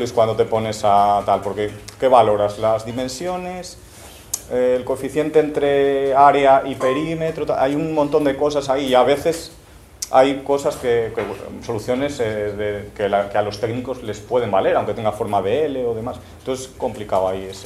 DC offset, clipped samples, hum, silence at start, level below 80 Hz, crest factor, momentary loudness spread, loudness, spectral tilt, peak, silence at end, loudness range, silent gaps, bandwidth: under 0.1%; under 0.1%; none; 0 s; -48 dBFS; 18 dB; 12 LU; -19 LUFS; -5 dB/octave; 0 dBFS; 0 s; 5 LU; none; 15 kHz